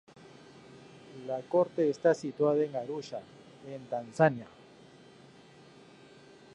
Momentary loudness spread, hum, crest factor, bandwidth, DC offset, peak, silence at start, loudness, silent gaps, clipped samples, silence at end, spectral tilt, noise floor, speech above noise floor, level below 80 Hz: 25 LU; none; 24 dB; 10.5 kHz; under 0.1%; -10 dBFS; 0.7 s; -30 LUFS; none; under 0.1%; 2.1 s; -7 dB/octave; -56 dBFS; 26 dB; -78 dBFS